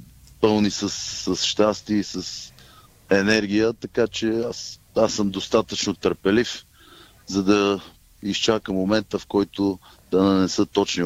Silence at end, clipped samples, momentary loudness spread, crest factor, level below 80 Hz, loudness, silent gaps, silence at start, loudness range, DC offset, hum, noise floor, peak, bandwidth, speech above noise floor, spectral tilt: 0 s; under 0.1%; 10 LU; 18 dB; -52 dBFS; -22 LUFS; none; 0 s; 1 LU; under 0.1%; none; -50 dBFS; -6 dBFS; 15.5 kHz; 28 dB; -4.5 dB/octave